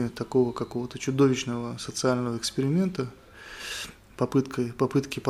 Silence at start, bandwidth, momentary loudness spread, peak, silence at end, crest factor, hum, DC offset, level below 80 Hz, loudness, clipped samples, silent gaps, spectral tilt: 0 s; 14.5 kHz; 12 LU; -10 dBFS; 0 s; 18 dB; none; under 0.1%; -56 dBFS; -28 LUFS; under 0.1%; none; -5.5 dB/octave